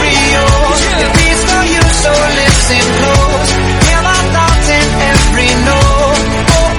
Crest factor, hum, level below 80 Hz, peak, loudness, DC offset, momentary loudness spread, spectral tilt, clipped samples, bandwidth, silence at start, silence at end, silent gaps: 8 dB; none; -14 dBFS; 0 dBFS; -9 LUFS; under 0.1%; 2 LU; -3.5 dB/octave; 0.5%; 13.5 kHz; 0 s; 0 s; none